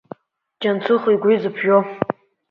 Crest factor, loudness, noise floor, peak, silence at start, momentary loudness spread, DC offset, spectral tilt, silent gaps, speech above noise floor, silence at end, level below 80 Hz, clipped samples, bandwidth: 20 dB; -19 LUFS; -46 dBFS; 0 dBFS; 0.6 s; 9 LU; under 0.1%; -8.5 dB/octave; none; 29 dB; 0.4 s; -64 dBFS; under 0.1%; 5.4 kHz